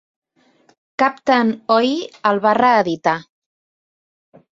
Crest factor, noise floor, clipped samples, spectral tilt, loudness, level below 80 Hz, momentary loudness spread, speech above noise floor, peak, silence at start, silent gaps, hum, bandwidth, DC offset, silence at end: 18 dB; -57 dBFS; under 0.1%; -5.5 dB/octave; -17 LUFS; -64 dBFS; 7 LU; 41 dB; -2 dBFS; 1 s; none; none; 7.8 kHz; under 0.1%; 1.3 s